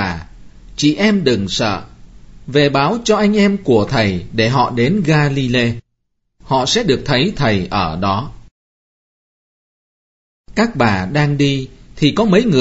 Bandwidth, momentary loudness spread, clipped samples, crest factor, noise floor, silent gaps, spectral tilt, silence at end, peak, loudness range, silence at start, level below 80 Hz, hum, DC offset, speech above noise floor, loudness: 8 kHz; 8 LU; under 0.1%; 16 dB; -69 dBFS; 8.51-10.44 s; -5.5 dB/octave; 0 s; 0 dBFS; 7 LU; 0 s; -40 dBFS; none; under 0.1%; 55 dB; -15 LUFS